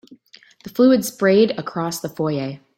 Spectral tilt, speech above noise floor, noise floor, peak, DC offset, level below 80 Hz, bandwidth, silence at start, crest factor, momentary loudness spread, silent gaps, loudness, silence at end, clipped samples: -5.5 dB/octave; 32 dB; -50 dBFS; -4 dBFS; under 0.1%; -62 dBFS; 16.5 kHz; 0.65 s; 16 dB; 10 LU; none; -19 LUFS; 0.2 s; under 0.1%